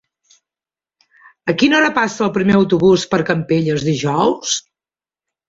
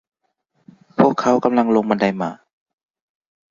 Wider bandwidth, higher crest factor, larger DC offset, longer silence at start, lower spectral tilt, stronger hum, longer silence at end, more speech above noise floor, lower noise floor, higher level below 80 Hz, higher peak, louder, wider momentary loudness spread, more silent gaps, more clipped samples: about the same, 7.8 kHz vs 7.4 kHz; about the same, 16 dB vs 20 dB; neither; first, 1.45 s vs 1 s; second, -5 dB/octave vs -7 dB/octave; neither; second, 0.9 s vs 1.15 s; first, over 75 dB vs 51 dB; first, under -90 dBFS vs -69 dBFS; first, -52 dBFS vs -60 dBFS; about the same, -2 dBFS vs 0 dBFS; about the same, -16 LUFS vs -18 LUFS; second, 8 LU vs 11 LU; neither; neither